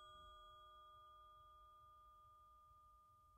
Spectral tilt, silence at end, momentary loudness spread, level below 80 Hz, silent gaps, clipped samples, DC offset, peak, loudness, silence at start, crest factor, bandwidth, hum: -3.5 dB/octave; 0 s; 6 LU; -76 dBFS; none; under 0.1%; under 0.1%; -52 dBFS; -65 LUFS; 0 s; 12 dB; 15 kHz; none